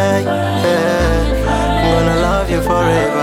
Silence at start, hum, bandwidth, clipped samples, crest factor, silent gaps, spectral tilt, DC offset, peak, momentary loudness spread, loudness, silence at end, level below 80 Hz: 0 s; none; 16 kHz; under 0.1%; 12 dB; none; -6 dB/octave; under 0.1%; -2 dBFS; 3 LU; -14 LUFS; 0 s; -22 dBFS